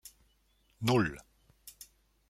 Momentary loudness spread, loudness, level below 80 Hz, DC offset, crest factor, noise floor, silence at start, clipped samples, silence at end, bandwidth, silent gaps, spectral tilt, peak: 25 LU; -31 LUFS; -62 dBFS; under 0.1%; 22 dB; -71 dBFS; 0.05 s; under 0.1%; 0.6 s; 16 kHz; none; -5.5 dB/octave; -16 dBFS